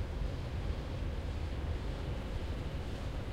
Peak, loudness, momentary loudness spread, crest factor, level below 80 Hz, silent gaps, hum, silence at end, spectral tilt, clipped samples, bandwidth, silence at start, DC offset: -24 dBFS; -40 LUFS; 2 LU; 12 dB; -40 dBFS; none; none; 0 s; -7 dB/octave; under 0.1%; 13 kHz; 0 s; under 0.1%